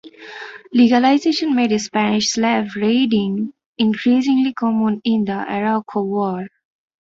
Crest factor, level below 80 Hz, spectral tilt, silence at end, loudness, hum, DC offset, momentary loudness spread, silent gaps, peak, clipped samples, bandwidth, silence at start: 16 dB; -60 dBFS; -5 dB/octave; 0.55 s; -18 LUFS; none; under 0.1%; 13 LU; 3.66-3.74 s; -2 dBFS; under 0.1%; 7.8 kHz; 0.05 s